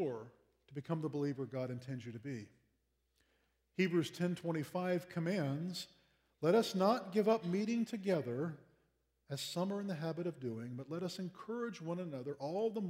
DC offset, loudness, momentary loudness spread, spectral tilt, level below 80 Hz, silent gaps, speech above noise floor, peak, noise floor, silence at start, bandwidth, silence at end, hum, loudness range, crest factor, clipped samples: under 0.1%; -39 LUFS; 13 LU; -6.5 dB/octave; -82 dBFS; none; 43 dB; -18 dBFS; -81 dBFS; 0 s; 16 kHz; 0 s; none; 7 LU; 20 dB; under 0.1%